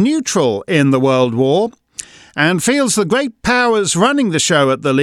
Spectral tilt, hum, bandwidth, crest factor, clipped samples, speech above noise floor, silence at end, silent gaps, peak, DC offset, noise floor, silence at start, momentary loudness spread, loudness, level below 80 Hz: -4 dB/octave; none; 14.5 kHz; 14 dB; under 0.1%; 21 dB; 0 s; none; 0 dBFS; under 0.1%; -35 dBFS; 0 s; 6 LU; -14 LUFS; -48 dBFS